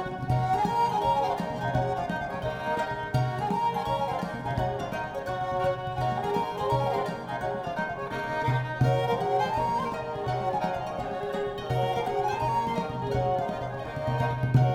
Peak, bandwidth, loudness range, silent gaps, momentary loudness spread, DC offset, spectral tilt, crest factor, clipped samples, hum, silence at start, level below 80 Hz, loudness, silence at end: -10 dBFS; 14 kHz; 2 LU; none; 7 LU; under 0.1%; -7 dB/octave; 18 dB; under 0.1%; none; 0 s; -48 dBFS; -29 LUFS; 0 s